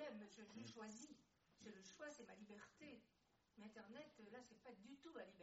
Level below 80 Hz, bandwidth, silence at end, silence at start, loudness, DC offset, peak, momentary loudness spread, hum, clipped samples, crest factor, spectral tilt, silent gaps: under -90 dBFS; 7.6 kHz; 0 s; 0 s; -61 LUFS; under 0.1%; -44 dBFS; 7 LU; none; under 0.1%; 18 dB; -3.5 dB/octave; none